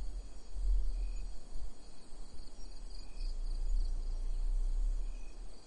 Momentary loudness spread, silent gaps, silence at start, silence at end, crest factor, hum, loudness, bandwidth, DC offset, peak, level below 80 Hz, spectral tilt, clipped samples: 15 LU; none; 0 s; 0 s; 12 dB; none; -43 LUFS; 9.6 kHz; under 0.1%; -22 dBFS; -36 dBFS; -5.5 dB/octave; under 0.1%